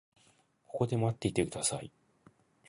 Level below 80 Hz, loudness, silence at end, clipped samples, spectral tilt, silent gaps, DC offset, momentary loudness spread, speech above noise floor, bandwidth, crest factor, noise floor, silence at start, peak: -60 dBFS; -33 LUFS; 0.8 s; under 0.1%; -5 dB/octave; none; under 0.1%; 12 LU; 36 dB; 11.5 kHz; 22 dB; -68 dBFS; 0.7 s; -14 dBFS